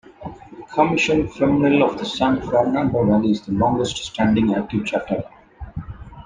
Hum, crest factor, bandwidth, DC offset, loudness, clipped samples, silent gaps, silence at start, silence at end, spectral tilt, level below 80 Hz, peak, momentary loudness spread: none; 18 dB; 9.6 kHz; under 0.1%; -19 LUFS; under 0.1%; none; 0.2 s; 0 s; -6 dB/octave; -44 dBFS; -2 dBFS; 19 LU